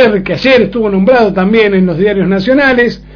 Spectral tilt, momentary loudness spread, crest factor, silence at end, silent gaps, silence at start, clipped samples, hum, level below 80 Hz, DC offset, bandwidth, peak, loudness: -7.5 dB/octave; 3 LU; 8 dB; 0 s; none; 0 s; 0.8%; none; -36 dBFS; under 0.1%; 5.4 kHz; 0 dBFS; -9 LUFS